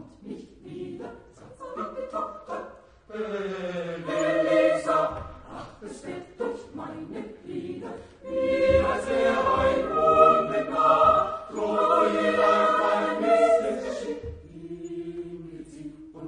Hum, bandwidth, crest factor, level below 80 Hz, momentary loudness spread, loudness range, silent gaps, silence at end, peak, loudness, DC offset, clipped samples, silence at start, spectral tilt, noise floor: none; 10.5 kHz; 22 dB; -52 dBFS; 21 LU; 14 LU; none; 0 s; -4 dBFS; -24 LUFS; under 0.1%; under 0.1%; 0 s; -5.5 dB/octave; -48 dBFS